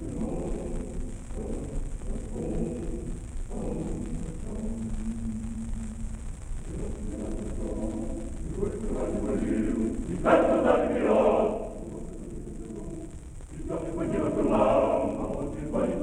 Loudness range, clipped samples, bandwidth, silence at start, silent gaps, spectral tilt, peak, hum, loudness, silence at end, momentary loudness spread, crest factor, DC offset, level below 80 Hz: 10 LU; under 0.1%; 11 kHz; 0 s; none; -7 dB/octave; -6 dBFS; none; -30 LUFS; 0 s; 17 LU; 22 dB; under 0.1%; -36 dBFS